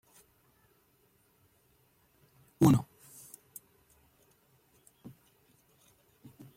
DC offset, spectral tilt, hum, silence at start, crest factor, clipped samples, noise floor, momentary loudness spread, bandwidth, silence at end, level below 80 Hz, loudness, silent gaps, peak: under 0.1%; -7.5 dB/octave; none; 2.6 s; 24 dB; under 0.1%; -69 dBFS; 30 LU; 16.5 kHz; 3.75 s; -66 dBFS; -27 LUFS; none; -12 dBFS